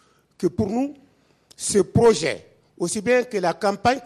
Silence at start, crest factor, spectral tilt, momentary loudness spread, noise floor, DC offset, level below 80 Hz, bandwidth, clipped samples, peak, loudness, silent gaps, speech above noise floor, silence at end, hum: 0.4 s; 16 dB; -4.5 dB/octave; 12 LU; -57 dBFS; under 0.1%; -50 dBFS; 13 kHz; under 0.1%; -6 dBFS; -22 LUFS; none; 36 dB; 0 s; none